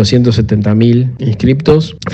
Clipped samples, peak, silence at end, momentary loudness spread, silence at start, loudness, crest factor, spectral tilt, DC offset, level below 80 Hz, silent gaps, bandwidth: 0.2%; 0 dBFS; 0 s; 3 LU; 0 s; -11 LUFS; 10 dB; -7.5 dB/octave; under 0.1%; -34 dBFS; none; 8.4 kHz